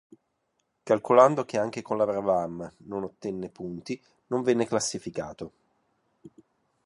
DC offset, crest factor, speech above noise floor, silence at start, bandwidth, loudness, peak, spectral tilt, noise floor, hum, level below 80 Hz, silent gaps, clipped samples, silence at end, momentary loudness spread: under 0.1%; 24 dB; 50 dB; 0.85 s; 11.5 kHz; -27 LUFS; -4 dBFS; -5 dB/octave; -76 dBFS; none; -66 dBFS; none; under 0.1%; 0.55 s; 18 LU